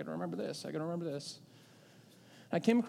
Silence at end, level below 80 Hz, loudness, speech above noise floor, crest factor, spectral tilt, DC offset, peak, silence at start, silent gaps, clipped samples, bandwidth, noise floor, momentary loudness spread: 0 s; -86 dBFS; -38 LUFS; 25 dB; 22 dB; -6 dB/octave; under 0.1%; -16 dBFS; 0 s; none; under 0.1%; 14 kHz; -60 dBFS; 25 LU